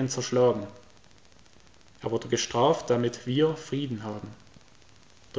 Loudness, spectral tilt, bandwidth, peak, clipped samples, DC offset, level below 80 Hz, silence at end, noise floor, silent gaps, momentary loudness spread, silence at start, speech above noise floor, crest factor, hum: -27 LUFS; -5 dB/octave; 8 kHz; -10 dBFS; under 0.1%; 0.2%; -62 dBFS; 0 s; -57 dBFS; none; 14 LU; 0 s; 31 dB; 18 dB; none